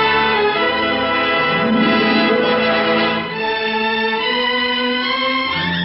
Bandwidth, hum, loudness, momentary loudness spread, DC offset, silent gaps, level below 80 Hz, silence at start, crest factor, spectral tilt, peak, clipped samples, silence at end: 5.8 kHz; none; -16 LUFS; 4 LU; under 0.1%; none; -48 dBFS; 0 s; 14 dB; -7.5 dB/octave; -2 dBFS; under 0.1%; 0 s